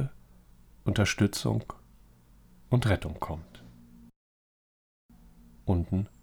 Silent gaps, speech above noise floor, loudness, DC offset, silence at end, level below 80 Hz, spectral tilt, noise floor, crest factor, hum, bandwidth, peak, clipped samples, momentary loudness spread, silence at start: 4.16-5.09 s; 29 dB; -30 LUFS; under 0.1%; 0.15 s; -48 dBFS; -6 dB/octave; -57 dBFS; 22 dB; none; 19 kHz; -12 dBFS; under 0.1%; 15 LU; 0 s